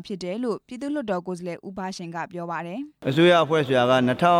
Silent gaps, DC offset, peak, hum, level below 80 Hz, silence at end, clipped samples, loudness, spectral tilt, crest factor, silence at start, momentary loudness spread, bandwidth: none; under 0.1%; -8 dBFS; none; -62 dBFS; 0 s; under 0.1%; -24 LUFS; -6 dB/octave; 16 dB; 0 s; 15 LU; 14 kHz